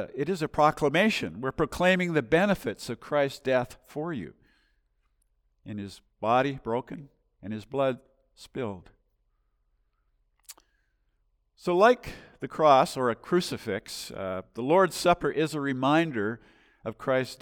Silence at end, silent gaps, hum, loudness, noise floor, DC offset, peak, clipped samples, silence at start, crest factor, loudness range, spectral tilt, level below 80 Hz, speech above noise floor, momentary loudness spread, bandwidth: 0.05 s; none; none; -27 LUFS; -72 dBFS; under 0.1%; -8 dBFS; under 0.1%; 0 s; 20 dB; 11 LU; -5.5 dB/octave; -58 dBFS; 45 dB; 18 LU; 18.5 kHz